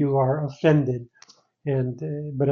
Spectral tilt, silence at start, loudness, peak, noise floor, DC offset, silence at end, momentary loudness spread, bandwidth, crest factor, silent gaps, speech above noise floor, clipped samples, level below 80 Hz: -8 dB/octave; 0 s; -24 LUFS; -6 dBFS; -53 dBFS; under 0.1%; 0 s; 11 LU; 6.8 kHz; 16 dB; none; 30 dB; under 0.1%; -60 dBFS